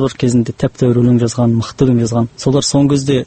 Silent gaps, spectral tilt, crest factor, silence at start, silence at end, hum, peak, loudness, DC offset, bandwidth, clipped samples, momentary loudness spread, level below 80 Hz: none; -6.5 dB/octave; 12 dB; 0 s; 0 s; none; 0 dBFS; -14 LUFS; under 0.1%; 8.8 kHz; under 0.1%; 4 LU; -40 dBFS